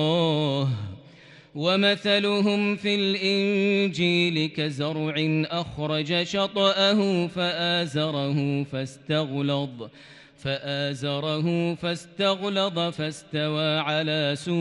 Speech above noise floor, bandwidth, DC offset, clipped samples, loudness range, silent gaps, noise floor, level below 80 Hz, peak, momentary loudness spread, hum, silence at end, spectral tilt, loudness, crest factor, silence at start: 25 dB; 11.5 kHz; under 0.1%; under 0.1%; 5 LU; none; -50 dBFS; -64 dBFS; -8 dBFS; 8 LU; none; 0 s; -5.5 dB/octave; -24 LUFS; 18 dB; 0 s